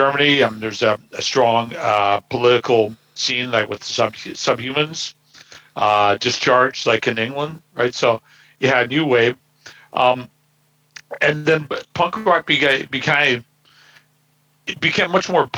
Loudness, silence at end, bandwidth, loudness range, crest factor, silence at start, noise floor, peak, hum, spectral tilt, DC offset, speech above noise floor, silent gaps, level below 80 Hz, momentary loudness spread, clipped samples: -18 LUFS; 0 s; over 20 kHz; 2 LU; 16 dB; 0 s; -61 dBFS; -2 dBFS; none; -4 dB/octave; under 0.1%; 43 dB; none; -62 dBFS; 9 LU; under 0.1%